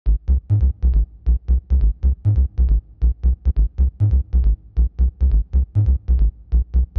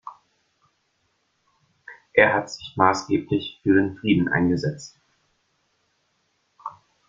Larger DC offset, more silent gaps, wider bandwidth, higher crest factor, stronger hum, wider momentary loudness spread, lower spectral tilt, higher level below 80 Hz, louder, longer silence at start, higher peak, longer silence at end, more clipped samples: neither; neither; second, 1.3 kHz vs 7.6 kHz; second, 8 dB vs 24 dB; neither; second, 3 LU vs 21 LU; first, -12 dB/octave vs -6 dB/octave; first, -18 dBFS vs -60 dBFS; about the same, -20 LUFS vs -22 LUFS; about the same, 0.05 s vs 0.05 s; second, -8 dBFS vs 0 dBFS; second, 0.15 s vs 0.4 s; neither